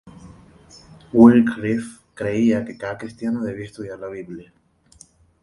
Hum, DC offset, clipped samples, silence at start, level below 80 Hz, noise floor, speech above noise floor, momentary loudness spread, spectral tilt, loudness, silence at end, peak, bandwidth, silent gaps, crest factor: none; under 0.1%; under 0.1%; 0.05 s; -54 dBFS; -52 dBFS; 33 dB; 22 LU; -7.5 dB/octave; -19 LUFS; 1 s; 0 dBFS; 11 kHz; none; 20 dB